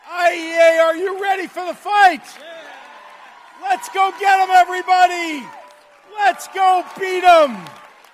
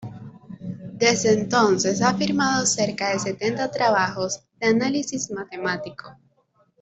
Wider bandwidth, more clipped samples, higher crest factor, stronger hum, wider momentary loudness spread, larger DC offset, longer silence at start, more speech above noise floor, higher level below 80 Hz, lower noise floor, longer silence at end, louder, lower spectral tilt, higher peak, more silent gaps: first, 15 kHz vs 8.2 kHz; neither; about the same, 16 dB vs 18 dB; neither; about the same, 19 LU vs 17 LU; neither; about the same, 0.05 s vs 0 s; second, 26 dB vs 42 dB; about the same, -62 dBFS vs -60 dBFS; second, -42 dBFS vs -64 dBFS; second, 0.4 s vs 0.65 s; first, -16 LUFS vs -22 LUFS; second, -2 dB/octave vs -3.5 dB/octave; first, -2 dBFS vs -6 dBFS; neither